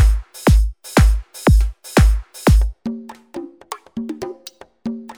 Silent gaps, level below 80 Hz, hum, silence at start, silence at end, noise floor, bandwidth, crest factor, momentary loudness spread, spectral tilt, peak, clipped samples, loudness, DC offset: none; -18 dBFS; none; 0 s; 0.05 s; -42 dBFS; 18.5 kHz; 16 dB; 18 LU; -6 dB/octave; 0 dBFS; under 0.1%; -18 LUFS; under 0.1%